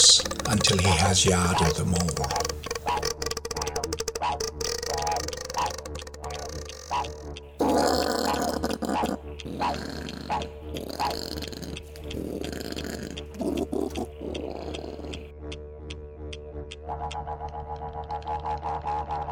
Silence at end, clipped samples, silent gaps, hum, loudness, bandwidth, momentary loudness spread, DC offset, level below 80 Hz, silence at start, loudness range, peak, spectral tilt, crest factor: 0 s; under 0.1%; none; none; -28 LUFS; over 20 kHz; 17 LU; under 0.1%; -44 dBFS; 0 s; 11 LU; -4 dBFS; -3 dB/octave; 24 dB